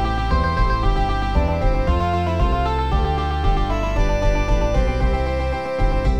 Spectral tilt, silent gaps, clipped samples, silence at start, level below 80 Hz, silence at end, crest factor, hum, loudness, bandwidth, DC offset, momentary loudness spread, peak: -7 dB/octave; none; under 0.1%; 0 s; -20 dBFS; 0 s; 12 dB; none; -21 LUFS; 8.4 kHz; 1%; 2 LU; -6 dBFS